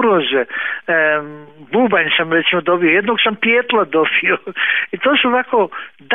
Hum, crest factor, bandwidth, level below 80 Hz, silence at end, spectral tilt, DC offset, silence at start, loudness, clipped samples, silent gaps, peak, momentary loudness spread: none; 14 dB; 4 kHz; -62 dBFS; 0 s; -8 dB/octave; 0.3%; 0 s; -15 LUFS; under 0.1%; none; -2 dBFS; 7 LU